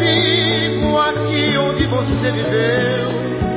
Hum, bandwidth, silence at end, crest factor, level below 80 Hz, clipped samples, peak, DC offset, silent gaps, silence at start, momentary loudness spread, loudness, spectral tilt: none; 4 kHz; 0 s; 12 dB; -34 dBFS; under 0.1%; -4 dBFS; under 0.1%; none; 0 s; 5 LU; -16 LUFS; -9.5 dB/octave